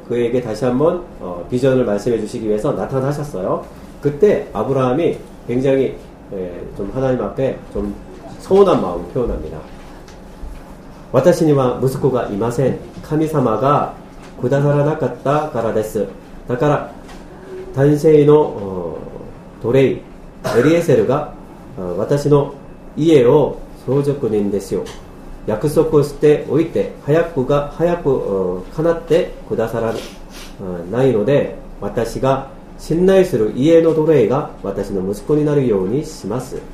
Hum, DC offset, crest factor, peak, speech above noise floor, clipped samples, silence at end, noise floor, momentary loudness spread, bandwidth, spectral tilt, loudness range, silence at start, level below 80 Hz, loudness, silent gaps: none; under 0.1%; 16 dB; 0 dBFS; 20 dB; under 0.1%; 0 s; -36 dBFS; 18 LU; 15 kHz; -7.5 dB/octave; 4 LU; 0 s; -38 dBFS; -17 LUFS; none